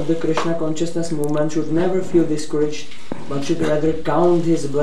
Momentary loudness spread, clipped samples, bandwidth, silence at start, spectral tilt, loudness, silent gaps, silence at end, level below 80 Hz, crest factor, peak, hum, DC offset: 9 LU; under 0.1%; 12.5 kHz; 0 s; -6.5 dB/octave; -20 LUFS; none; 0 s; -50 dBFS; 16 dB; -4 dBFS; none; 9%